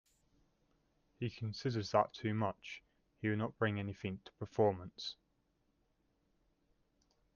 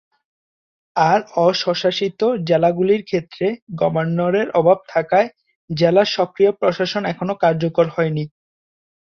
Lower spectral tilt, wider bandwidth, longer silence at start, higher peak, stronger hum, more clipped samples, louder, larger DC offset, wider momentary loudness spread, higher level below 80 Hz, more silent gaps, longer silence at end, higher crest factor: about the same, -6.5 dB/octave vs -6.5 dB/octave; about the same, 7.2 kHz vs 7 kHz; first, 1.2 s vs 0.95 s; second, -18 dBFS vs -2 dBFS; neither; neither; second, -39 LUFS vs -18 LUFS; neither; first, 13 LU vs 7 LU; second, -74 dBFS vs -60 dBFS; second, none vs 3.62-3.67 s, 5.55-5.68 s; first, 2.25 s vs 0.9 s; first, 24 dB vs 16 dB